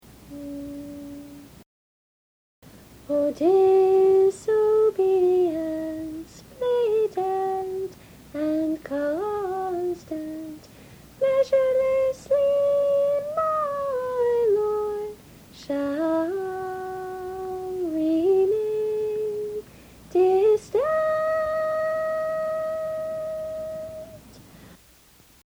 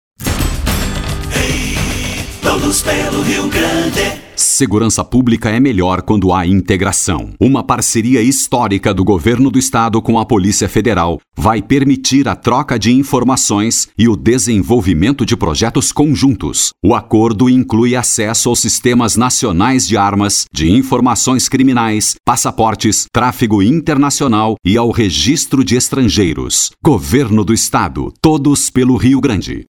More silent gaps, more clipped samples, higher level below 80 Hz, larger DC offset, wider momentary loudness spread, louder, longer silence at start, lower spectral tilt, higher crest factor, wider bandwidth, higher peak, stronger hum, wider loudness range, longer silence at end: first, 1.66-2.62 s vs none; neither; second, -58 dBFS vs -30 dBFS; neither; first, 16 LU vs 4 LU; second, -24 LUFS vs -12 LUFS; about the same, 0.25 s vs 0.2 s; first, -6 dB/octave vs -4.5 dB/octave; about the same, 14 dB vs 12 dB; about the same, over 20 kHz vs 19.5 kHz; second, -10 dBFS vs 0 dBFS; neither; first, 8 LU vs 2 LU; first, 0.7 s vs 0.05 s